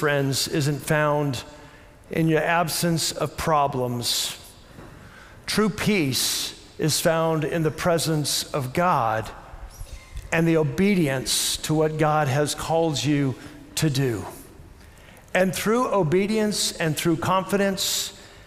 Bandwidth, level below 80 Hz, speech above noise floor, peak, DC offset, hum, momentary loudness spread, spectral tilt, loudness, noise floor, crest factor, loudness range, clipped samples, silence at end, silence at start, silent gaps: 16 kHz; -48 dBFS; 24 dB; -8 dBFS; under 0.1%; none; 11 LU; -4.5 dB/octave; -23 LUFS; -47 dBFS; 16 dB; 3 LU; under 0.1%; 0.05 s; 0 s; none